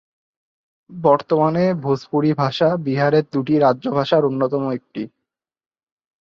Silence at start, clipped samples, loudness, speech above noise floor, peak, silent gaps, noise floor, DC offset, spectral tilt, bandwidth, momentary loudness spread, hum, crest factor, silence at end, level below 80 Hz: 0.9 s; under 0.1%; -18 LUFS; 64 dB; -2 dBFS; none; -82 dBFS; under 0.1%; -8 dB/octave; 7 kHz; 8 LU; none; 18 dB; 1.15 s; -62 dBFS